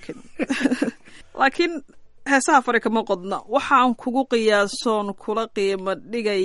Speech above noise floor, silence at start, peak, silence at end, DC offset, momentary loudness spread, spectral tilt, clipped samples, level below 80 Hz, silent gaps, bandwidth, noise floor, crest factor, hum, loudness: 19 dB; 0 s; -4 dBFS; 0 s; under 0.1%; 10 LU; -3.5 dB/octave; under 0.1%; -56 dBFS; none; 11.5 kHz; -40 dBFS; 18 dB; none; -21 LUFS